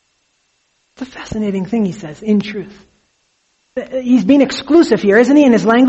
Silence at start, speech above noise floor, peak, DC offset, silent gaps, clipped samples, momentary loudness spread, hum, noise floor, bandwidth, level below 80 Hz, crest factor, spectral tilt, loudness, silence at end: 1 s; 50 dB; 0 dBFS; under 0.1%; none; under 0.1%; 19 LU; none; -63 dBFS; 8.2 kHz; -50 dBFS; 14 dB; -6 dB/octave; -13 LUFS; 0 s